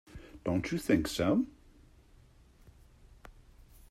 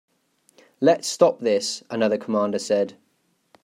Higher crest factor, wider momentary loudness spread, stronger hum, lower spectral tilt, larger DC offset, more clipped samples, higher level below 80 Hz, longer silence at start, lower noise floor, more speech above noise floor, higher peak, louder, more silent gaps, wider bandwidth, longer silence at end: about the same, 20 dB vs 20 dB; first, 11 LU vs 5 LU; neither; first, -6 dB/octave vs -4 dB/octave; neither; neither; first, -56 dBFS vs -76 dBFS; second, 0.15 s vs 0.8 s; second, -60 dBFS vs -68 dBFS; second, 30 dB vs 47 dB; second, -16 dBFS vs -4 dBFS; second, -32 LUFS vs -22 LUFS; neither; about the same, 14.5 kHz vs 15 kHz; about the same, 0.6 s vs 0.7 s